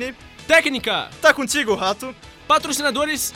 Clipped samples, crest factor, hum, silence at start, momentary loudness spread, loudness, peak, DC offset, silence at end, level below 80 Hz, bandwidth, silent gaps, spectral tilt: under 0.1%; 18 dB; none; 0 s; 14 LU; -19 LUFS; -2 dBFS; under 0.1%; 0 s; -50 dBFS; 16.5 kHz; none; -2 dB/octave